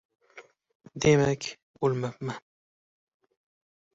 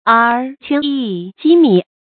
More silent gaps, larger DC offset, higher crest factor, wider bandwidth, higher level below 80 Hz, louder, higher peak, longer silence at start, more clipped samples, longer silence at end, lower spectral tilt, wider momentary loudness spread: first, 0.75-0.80 s, 1.62-1.74 s vs none; neither; first, 22 dB vs 14 dB; first, 8 kHz vs 4.6 kHz; about the same, -60 dBFS vs -64 dBFS; second, -27 LUFS vs -14 LUFS; second, -10 dBFS vs 0 dBFS; first, 0.35 s vs 0.05 s; neither; first, 1.55 s vs 0.3 s; second, -5.5 dB/octave vs -9 dB/octave; first, 17 LU vs 10 LU